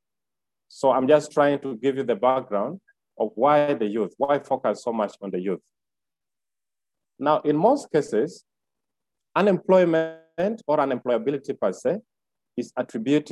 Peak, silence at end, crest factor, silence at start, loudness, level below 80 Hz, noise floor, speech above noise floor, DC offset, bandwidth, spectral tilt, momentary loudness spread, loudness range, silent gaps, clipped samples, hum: -6 dBFS; 0 s; 18 dB; 0.75 s; -23 LUFS; -72 dBFS; under -90 dBFS; over 67 dB; under 0.1%; 11.5 kHz; -6.5 dB/octave; 11 LU; 4 LU; none; under 0.1%; none